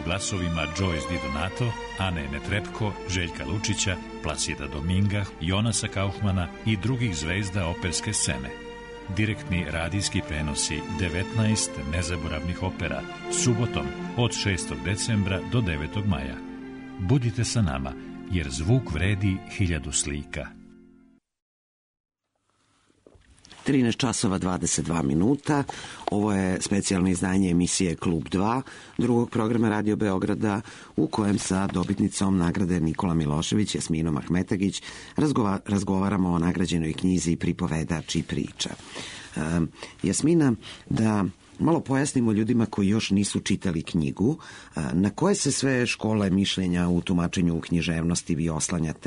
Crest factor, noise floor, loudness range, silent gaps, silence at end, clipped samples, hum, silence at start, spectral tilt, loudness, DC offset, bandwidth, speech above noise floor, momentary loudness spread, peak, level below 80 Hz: 14 dB; -73 dBFS; 4 LU; 21.42-21.94 s, 22.00-22.04 s; 0 s; under 0.1%; none; 0 s; -5 dB/octave; -26 LUFS; under 0.1%; 11 kHz; 48 dB; 8 LU; -12 dBFS; -44 dBFS